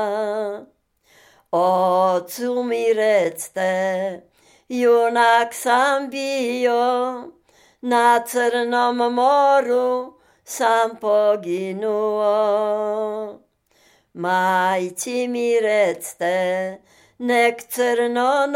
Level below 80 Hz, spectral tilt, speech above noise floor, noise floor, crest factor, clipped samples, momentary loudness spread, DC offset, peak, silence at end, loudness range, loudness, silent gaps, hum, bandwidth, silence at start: -74 dBFS; -3.5 dB/octave; 40 dB; -59 dBFS; 16 dB; under 0.1%; 11 LU; under 0.1%; -4 dBFS; 0 s; 3 LU; -20 LUFS; none; none; 16.5 kHz; 0 s